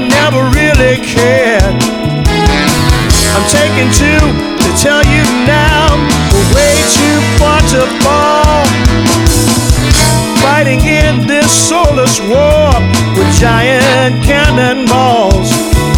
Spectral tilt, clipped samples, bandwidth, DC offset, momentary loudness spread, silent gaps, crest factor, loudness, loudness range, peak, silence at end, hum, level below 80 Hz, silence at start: -4.5 dB/octave; 2%; over 20 kHz; under 0.1%; 2 LU; none; 8 dB; -8 LUFS; 1 LU; 0 dBFS; 0 s; none; -16 dBFS; 0 s